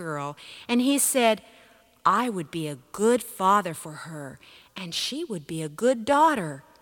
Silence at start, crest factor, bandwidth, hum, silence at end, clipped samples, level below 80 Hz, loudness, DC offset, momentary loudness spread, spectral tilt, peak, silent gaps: 0 s; 20 dB; 19 kHz; none; 0.2 s; under 0.1%; -68 dBFS; -25 LUFS; under 0.1%; 17 LU; -3.5 dB/octave; -6 dBFS; none